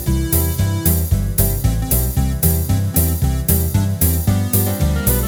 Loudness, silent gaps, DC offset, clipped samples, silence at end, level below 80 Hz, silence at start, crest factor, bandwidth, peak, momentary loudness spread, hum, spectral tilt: -17 LUFS; none; under 0.1%; under 0.1%; 0 s; -22 dBFS; 0 s; 14 dB; over 20 kHz; -2 dBFS; 2 LU; none; -5.5 dB/octave